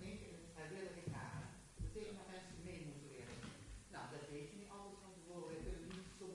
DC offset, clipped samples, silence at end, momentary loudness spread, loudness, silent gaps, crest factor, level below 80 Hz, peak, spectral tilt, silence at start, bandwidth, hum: under 0.1%; under 0.1%; 0 s; 6 LU; -53 LUFS; none; 16 dB; -60 dBFS; -36 dBFS; -5 dB/octave; 0 s; 11.5 kHz; none